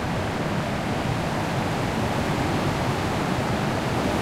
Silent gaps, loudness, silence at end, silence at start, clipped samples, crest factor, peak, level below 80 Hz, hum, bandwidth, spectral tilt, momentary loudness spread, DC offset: none; -25 LUFS; 0 s; 0 s; under 0.1%; 14 dB; -10 dBFS; -40 dBFS; none; 16 kHz; -5.5 dB/octave; 2 LU; under 0.1%